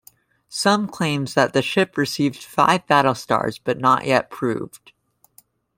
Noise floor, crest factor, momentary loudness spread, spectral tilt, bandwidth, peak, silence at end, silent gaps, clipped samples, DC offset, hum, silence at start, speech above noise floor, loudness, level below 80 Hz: -56 dBFS; 18 dB; 8 LU; -4.5 dB/octave; 16.5 kHz; -2 dBFS; 1 s; none; under 0.1%; under 0.1%; none; 0.5 s; 36 dB; -20 LUFS; -60 dBFS